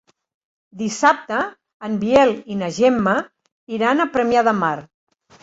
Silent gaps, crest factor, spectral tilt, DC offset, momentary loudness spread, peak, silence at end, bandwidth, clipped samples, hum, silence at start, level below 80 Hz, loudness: 1.74-1.80 s, 3.52-3.67 s; 18 dB; -5 dB/octave; under 0.1%; 13 LU; -2 dBFS; 0.6 s; 8.2 kHz; under 0.1%; none; 0.75 s; -58 dBFS; -19 LUFS